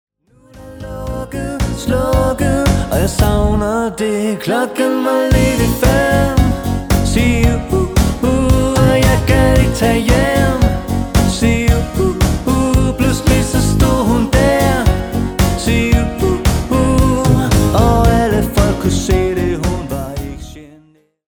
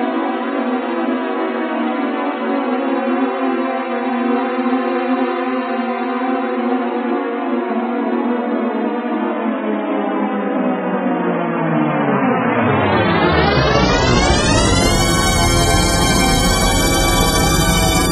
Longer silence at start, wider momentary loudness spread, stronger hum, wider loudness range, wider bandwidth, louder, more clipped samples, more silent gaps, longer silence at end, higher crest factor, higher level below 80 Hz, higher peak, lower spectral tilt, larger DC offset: first, 0.55 s vs 0 s; about the same, 7 LU vs 6 LU; neither; second, 3 LU vs 6 LU; first, over 20 kHz vs 13 kHz; about the same, -14 LUFS vs -16 LUFS; neither; neither; first, 0.65 s vs 0 s; about the same, 14 dB vs 16 dB; first, -20 dBFS vs -26 dBFS; about the same, 0 dBFS vs 0 dBFS; first, -6 dB/octave vs -4.5 dB/octave; neither